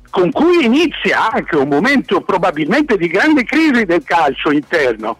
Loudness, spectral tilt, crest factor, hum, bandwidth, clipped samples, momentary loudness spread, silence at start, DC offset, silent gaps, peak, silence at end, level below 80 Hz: -13 LUFS; -5.5 dB/octave; 8 dB; none; 13 kHz; under 0.1%; 4 LU; 0.15 s; under 0.1%; none; -6 dBFS; 0.05 s; -46 dBFS